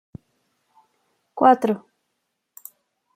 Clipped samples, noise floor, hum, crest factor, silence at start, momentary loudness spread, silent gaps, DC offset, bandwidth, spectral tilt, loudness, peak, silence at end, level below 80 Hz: under 0.1%; -77 dBFS; none; 22 dB; 1.35 s; 26 LU; none; under 0.1%; 16 kHz; -6.5 dB/octave; -19 LUFS; -2 dBFS; 1.4 s; -68 dBFS